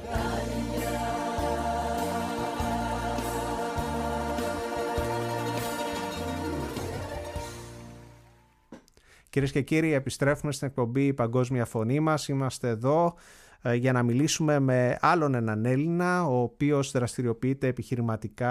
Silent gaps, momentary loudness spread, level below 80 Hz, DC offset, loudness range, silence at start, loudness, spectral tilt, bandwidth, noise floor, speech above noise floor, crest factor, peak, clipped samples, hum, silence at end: none; 8 LU; -46 dBFS; under 0.1%; 8 LU; 0 s; -28 LUFS; -6 dB/octave; 15.5 kHz; -59 dBFS; 33 dB; 20 dB; -8 dBFS; under 0.1%; none; 0 s